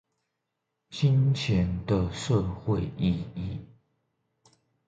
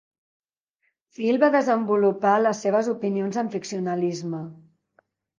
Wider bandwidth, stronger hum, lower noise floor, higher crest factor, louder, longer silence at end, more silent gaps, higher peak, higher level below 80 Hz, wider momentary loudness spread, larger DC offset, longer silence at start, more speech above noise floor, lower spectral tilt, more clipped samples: about the same, 9 kHz vs 9.6 kHz; neither; first, -82 dBFS vs -74 dBFS; about the same, 18 dB vs 18 dB; second, -28 LUFS vs -23 LUFS; first, 1.25 s vs 0.85 s; neither; second, -12 dBFS vs -6 dBFS; first, -46 dBFS vs -78 dBFS; about the same, 13 LU vs 11 LU; neither; second, 0.9 s vs 1.2 s; first, 56 dB vs 52 dB; about the same, -7 dB/octave vs -6 dB/octave; neither